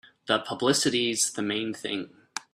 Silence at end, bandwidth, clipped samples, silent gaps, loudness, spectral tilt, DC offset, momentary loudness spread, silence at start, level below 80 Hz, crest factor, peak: 0.15 s; 15 kHz; under 0.1%; none; -26 LUFS; -2.5 dB/octave; under 0.1%; 11 LU; 0.25 s; -68 dBFS; 20 dB; -8 dBFS